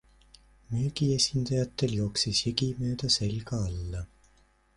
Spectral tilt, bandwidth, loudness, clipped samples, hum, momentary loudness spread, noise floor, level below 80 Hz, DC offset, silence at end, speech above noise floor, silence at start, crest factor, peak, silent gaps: -4.5 dB/octave; 11.5 kHz; -29 LUFS; under 0.1%; none; 10 LU; -64 dBFS; -46 dBFS; under 0.1%; 0.7 s; 35 dB; 0.7 s; 20 dB; -10 dBFS; none